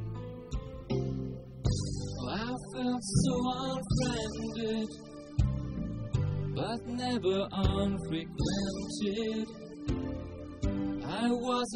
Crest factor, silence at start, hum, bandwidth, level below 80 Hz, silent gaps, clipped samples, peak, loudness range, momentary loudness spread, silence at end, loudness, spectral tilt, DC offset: 18 dB; 0 s; none; 11.5 kHz; -44 dBFS; none; under 0.1%; -14 dBFS; 2 LU; 10 LU; 0 s; -34 LUFS; -6 dB/octave; under 0.1%